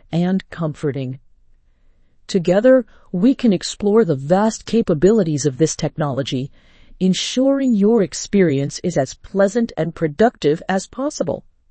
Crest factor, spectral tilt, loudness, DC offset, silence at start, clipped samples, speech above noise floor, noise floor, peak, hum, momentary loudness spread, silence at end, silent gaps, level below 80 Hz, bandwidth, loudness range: 16 dB; -6 dB/octave; -18 LUFS; under 0.1%; 0.1 s; under 0.1%; 36 dB; -53 dBFS; -2 dBFS; none; 9 LU; 0.3 s; none; -48 dBFS; 8.8 kHz; 3 LU